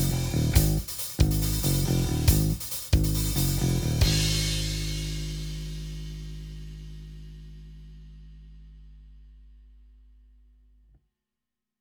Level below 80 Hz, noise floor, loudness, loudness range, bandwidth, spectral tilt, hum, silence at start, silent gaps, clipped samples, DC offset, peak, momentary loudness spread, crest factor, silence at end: -34 dBFS; -88 dBFS; -26 LUFS; 21 LU; over 20 kHz; -4.5 dB/octave; none; 0 s; none; under 0.1%; under 0.1%; -6 dBFS; 22 LU; 22 dB; 2.3 s